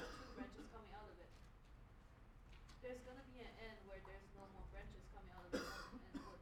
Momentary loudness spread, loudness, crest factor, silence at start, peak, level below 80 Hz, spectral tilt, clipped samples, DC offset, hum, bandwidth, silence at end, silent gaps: 16 LU; -56 LUFS; 24 dB; 0 s; -30 dBFS; -62 dBFS; -5 dB/octave; under 0.1%; under 0.1%; none; 17 kHz; 0 s; none